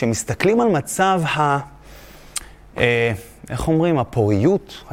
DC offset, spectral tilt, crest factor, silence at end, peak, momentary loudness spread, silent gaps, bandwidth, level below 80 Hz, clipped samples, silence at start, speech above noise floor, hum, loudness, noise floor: under 0.1%; -5.5 dB/octave; 18 dB; 0 s; -2 dBFS; 13 LU; none; 16.5 kHz; -42 dBFS; under 0.1%; 0 s; 23 dB; none; -19 LUFS; -42 dBFS